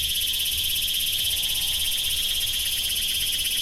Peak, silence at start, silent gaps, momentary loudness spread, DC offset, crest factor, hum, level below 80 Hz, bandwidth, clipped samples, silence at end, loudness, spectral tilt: -12 dBFS; 0 s; none; 1 LU; under 0.1%; 14 dB; none; -42 dBFS; 16 kHz; under 0.1%; 0 s; -22 LUFS; 1.5 dB/octave